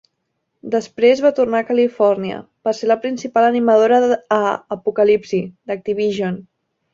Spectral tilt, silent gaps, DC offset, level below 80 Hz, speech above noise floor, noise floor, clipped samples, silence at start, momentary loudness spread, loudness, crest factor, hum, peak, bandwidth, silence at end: -6 dB/octave; none; under 0.1%; -62 dBFS; 56 dB; -73 dBFS; under 0.1%; 0.65 s; 11 LU; -17 LUFS; 16 dB; none; -2 dBFS; 7.6 kHz; 0.55 s